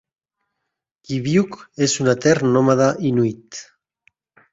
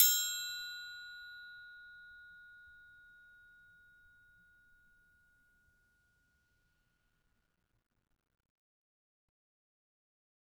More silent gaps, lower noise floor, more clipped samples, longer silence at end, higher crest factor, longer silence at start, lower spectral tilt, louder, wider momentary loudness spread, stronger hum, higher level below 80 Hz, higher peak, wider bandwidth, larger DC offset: neither; about the same, -80 dBFS vs -79 dBFS; neither; second, 0.9 s vs 7.8 s; second, 18 dB vs 34 dB; first, 1.1 s vs 0 s; first, -5.5 dB/octave vs 5 dB/octave; first, -18 LUFS vs -36 LUFS; second, 14 LU vs 25 LU; neither; first, -58 dBFS vs -80 dBFS; first, -2 dBFS vs -8 dBFS; second, 8 kHz vs over 20 kHz; neither